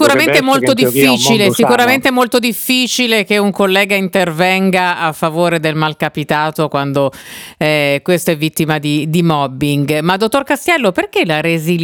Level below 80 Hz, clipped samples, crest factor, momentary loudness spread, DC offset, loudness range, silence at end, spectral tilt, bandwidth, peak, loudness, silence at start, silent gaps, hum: -52 dBFS; under 0.1%; 12 dB; 6 LU; under 0.1%; 4 LU; 0 s; -4.5 dB/octave; over 20 kHz; 0 dBFS; -13 LUFS; 0 s; none; none